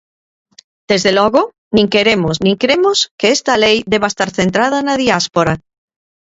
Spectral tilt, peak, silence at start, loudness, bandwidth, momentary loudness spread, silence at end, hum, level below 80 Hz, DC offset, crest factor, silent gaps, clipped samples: -4 dB/octave; 0 dBFS; 0.9 s; -13 LUFS; 8 kHz; 4 LU; 0.7 s; none; -46 dBFS; under 0.1%; 14 dB; 1.58-1.71 s, 3.11-3.18 s; under 0.1%